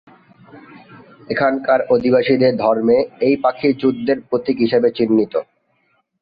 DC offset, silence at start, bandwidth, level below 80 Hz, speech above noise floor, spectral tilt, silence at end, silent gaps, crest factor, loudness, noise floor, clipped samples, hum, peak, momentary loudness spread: under 0.1%; 0.55 s; 5 kHz; -56 dBFS; 48 dB; -9.5 dB/octave; 0.8 s; none; 16 dB; -17 LUFS; -64 dBFS; under 0.1%; none; -2 dBFS; 6 LU